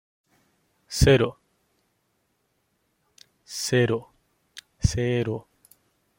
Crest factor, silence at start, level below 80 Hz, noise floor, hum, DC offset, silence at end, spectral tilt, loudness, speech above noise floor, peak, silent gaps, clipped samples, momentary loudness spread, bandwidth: 22 dB; 0.9 s; -40 dBFS; -72 dBFS; none; under 0.1%; 0.8 s; -5 dB/octave; -24 LUFS; 50 dB; -4 dBFS; none; under 0.1%; 22 LU; 16.5 kHz